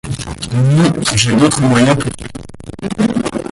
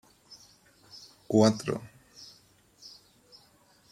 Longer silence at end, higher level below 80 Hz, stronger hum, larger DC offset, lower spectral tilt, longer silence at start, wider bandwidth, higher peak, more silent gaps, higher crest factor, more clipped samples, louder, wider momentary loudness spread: second, 0.05 s vs 1.05 s; first, -36 dBFS vs -70 dBFS; neither; neither; about the same, -5 dB/octave vs -6 dB/octave; second, 0.05 s vs 0.95 s; second, 11.5 kHz vs 14.5 kHz; first, 0 dBFS vs -10 dBFS; neither; second, 14 dB vs 24 dB; neither; first, -13 LUFS vs -27 LUFS; second, 17 LU vs 28 LU